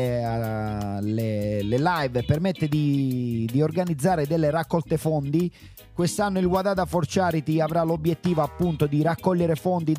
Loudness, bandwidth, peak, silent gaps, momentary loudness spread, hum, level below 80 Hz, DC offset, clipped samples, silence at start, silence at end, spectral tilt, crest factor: -24 LUFS; 16 kHz; -8 dBFS; none; 4 LU; none; -48 dBFS; under 0.1%; under 0.1%; 0 s; 0 s; -7 dB/octave; 14 dB